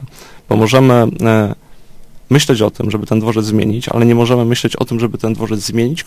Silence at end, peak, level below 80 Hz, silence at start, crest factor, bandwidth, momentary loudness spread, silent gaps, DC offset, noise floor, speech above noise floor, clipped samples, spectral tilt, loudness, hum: 0 s; 0 dBFS; -42 dBFS; 0 s; 14 dB; 15.5 kHz; 8 LU; none; under 0.1%; -34 dBFS; 21 dB; 0.2%; -6 dB/octave; -13 LUFS; none